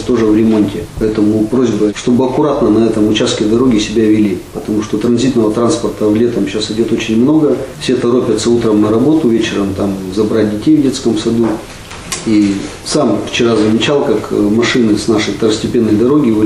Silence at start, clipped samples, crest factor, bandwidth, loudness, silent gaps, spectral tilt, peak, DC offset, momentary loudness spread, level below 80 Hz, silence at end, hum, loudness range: 0 s; under 0.1%; 10 dB; 12.5 kHz; -12 LUFS; none; -5.5 dB/octave; -2 dBFS; under 0.1%; 6 LU; -38 dBFS; 0 s; none; 2 LU